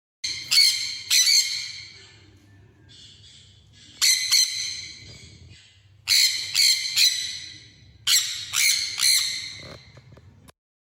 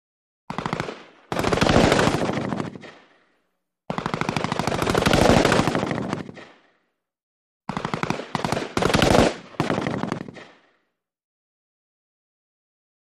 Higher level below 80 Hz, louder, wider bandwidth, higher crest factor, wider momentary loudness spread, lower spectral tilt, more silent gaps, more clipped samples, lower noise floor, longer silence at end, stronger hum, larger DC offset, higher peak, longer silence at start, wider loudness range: second, -64 dBFS vs -40 dBFS; first, -19 LUFS vs -22 LUFS; first, 19.5 kHz vs 15 kHz; second, 18 dB vs 24 dB; about the same, 18 LU vs 16 LU; second, 3 dB/octave vs -5 dB/octave; second, none vs 7.23-7.60 s; neither; second, -53 dBFS vs -75 dBFS; second, 1.05 s vs 2.65 s; neither; neither; second, -8 dBFS vs -2 dBFS; second, 0.25 s vs 0.5 s; second, 4 LU vs 7 LU